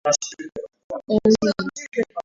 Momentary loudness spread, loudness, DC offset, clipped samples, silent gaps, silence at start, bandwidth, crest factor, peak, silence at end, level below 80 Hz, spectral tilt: 17 LU; -22 LUFS; under 0.1%; under 0.1%; 0.84-0.90 s; 0.05 s; 7.8 kHz; 18 dB; -6 dBFS; 0.05 s; -54 dBFS; -4 dB/octave